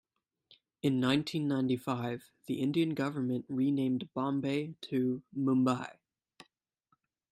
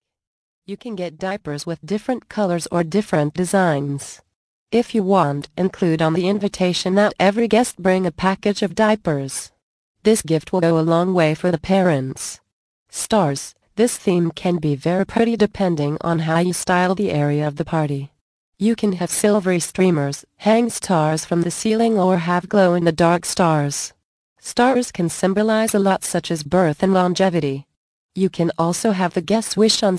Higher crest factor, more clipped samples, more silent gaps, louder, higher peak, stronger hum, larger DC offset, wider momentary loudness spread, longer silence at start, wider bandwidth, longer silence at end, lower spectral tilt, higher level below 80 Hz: about the same, 18 dB vs 16 dB; neither; second, none vs 4.35-4.66 s, 9.62-9.95 s, 12.52-12.86 s, 18.21-18.52 s, 24.04-24.36 s, 27.77-28.09 s; second, -33 LUFS vs -19 LUFS; second, -16 dBFS vs -2 dBFS; neither; neither; second, 7 LU vs 10 LU; first, 0.85 s vs 0.7 s; first, 13 kHz vs 11 kHz; first, 1.4 s vs 0 s; first, -7 dB/octave vs -5.5 dB/octave; second, -74 dBFS vs -52 dBFS